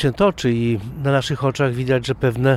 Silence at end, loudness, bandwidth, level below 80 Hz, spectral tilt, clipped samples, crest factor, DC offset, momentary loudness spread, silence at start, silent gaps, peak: 0 s; -20 LUFS; 13 kHz; -42 dBFS; -6.5 dB/octave; under 0.1%; 16 dB; under 0.1%; 4 LU; 0 s; none; -4 dBFS